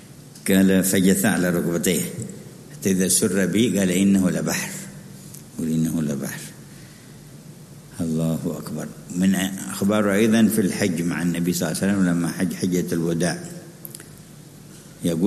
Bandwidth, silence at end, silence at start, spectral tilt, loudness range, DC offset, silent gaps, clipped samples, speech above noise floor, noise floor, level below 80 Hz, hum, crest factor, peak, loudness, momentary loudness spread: 13.5 kHz; 0 s; 0 s; -5 dB/octave; 8 LU; under 0.1%; none; under 0.1%; 23 dB; -43 dBFS; -56 dBFS; none; 18 dB; -4 dBFS; -21 LUFS; 22 LU